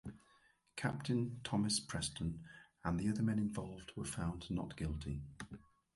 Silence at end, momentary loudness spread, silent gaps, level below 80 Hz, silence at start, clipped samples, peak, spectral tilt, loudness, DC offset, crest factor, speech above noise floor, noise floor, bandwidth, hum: 0.35 s; 16 LU; none; -56 dBFS; 0.05 s; under 0.1%; -22 dBFS; -5 dB/octave; -40 LUFS; under 0.1%; 18 dB; 32 dB; -72 dBFS; 11.5 kHz; none